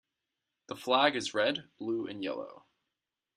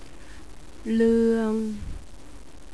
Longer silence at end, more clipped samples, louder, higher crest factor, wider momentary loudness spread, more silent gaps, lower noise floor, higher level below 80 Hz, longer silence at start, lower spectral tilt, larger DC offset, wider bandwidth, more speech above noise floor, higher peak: first, 0.8 s vs 0.05 s; neither; second, -31 LUFS vs -23 LUFS; first, 24 dB vs 16 dB; second, 15 LU vs 26 LU; neither; first, -88 dBFS vs -46 dBFS; second, -80 dBFS vs -44 dBFS; first, 0.7 s vs 0 s; second, -3.5 dB/octave vs -7 dB/octave; second, under 0.1% vs 1%; first, 13.5 kHz vs 11 kHz; first, 57 dB vs 23 dB; about the same, -10 dBFS vs -12 dBFS